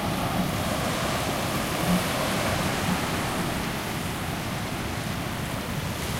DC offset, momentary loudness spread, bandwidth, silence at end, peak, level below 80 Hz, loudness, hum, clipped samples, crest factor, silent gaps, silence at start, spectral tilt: under 0.1%; 5 LU; 16 kHz; 0 s; -12 dBFS; -42 dBFS; -27 LUFS; none; under 0.1%; 16 dB; none; 0 s; -4.5 dB/octave